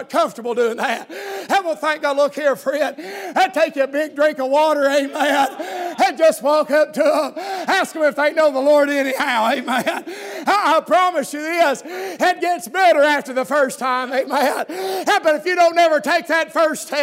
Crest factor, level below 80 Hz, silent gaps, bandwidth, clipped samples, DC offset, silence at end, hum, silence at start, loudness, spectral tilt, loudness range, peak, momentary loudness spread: 14 dB; -80 dBFS; none; 16 kHz; under 0.1%; under 0.1%; 0 s; none; 0 s; -18 LUFS; -2.5 dB/octave; 2 LU; -4 dBFS; 9 LU